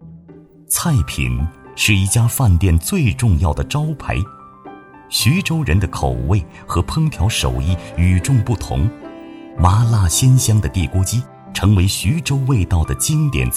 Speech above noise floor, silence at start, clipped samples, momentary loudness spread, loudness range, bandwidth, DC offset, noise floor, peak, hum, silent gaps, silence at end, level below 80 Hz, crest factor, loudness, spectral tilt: 27 dB; 0 s; under 0.1%; 9 LU; 3 LU; 15.5 kHz; under 0.1%; -42 dBFS; 0 dBFS; none; none; 0 s; -28 dBFS; 16 dB; -17 LUFS; -5 dB/octave